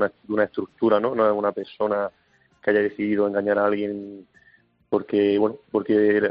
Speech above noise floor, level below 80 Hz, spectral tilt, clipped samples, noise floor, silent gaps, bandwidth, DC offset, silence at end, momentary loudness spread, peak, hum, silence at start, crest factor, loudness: 37 dB; -66 dBFS; -5 dB/octave; under 0.1%; -59 dBFS; none; 5.2 kHz; under 0.1%; 0 s; 8 LU; -6 dBFS; none; 0 s; 16 dB; -23 LUFS